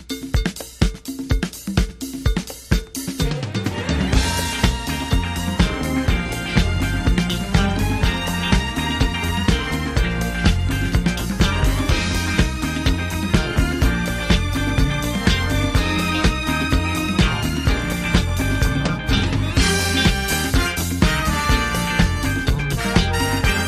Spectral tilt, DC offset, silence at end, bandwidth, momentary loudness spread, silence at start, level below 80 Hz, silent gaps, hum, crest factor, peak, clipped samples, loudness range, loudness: -4.5 dB/octave; under 0.1%; 0 s; 15.5 kHz; 5 LU; 0 s; -24 dBFS; none; none; 18 dB; 0 dBFS; under 0.1%; 3 LU; -20 LUFS